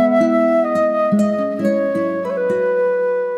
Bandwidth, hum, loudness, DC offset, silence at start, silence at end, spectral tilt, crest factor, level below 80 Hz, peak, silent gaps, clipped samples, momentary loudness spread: 12 kHz; none; -17 LUFS; under 0.1%; 0 s; 0 s; -7.5 dB/octave; 12 dB; -70 dBFS; -4 dBFS; none; under 0.1%; 5 LU